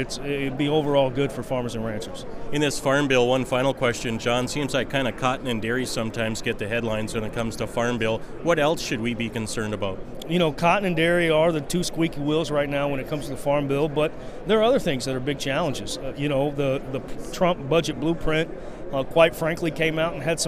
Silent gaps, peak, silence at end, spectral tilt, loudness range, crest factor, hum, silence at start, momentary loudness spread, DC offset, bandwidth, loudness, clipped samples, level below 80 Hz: none; -4 dBFS; 0 s; -5 dB/octave; 3 LU; 20 dB; none; 0 s; 9 LU; under 0.1%; 15.5 kHz; -24 LUFS; under 0.1%; -42 dBFS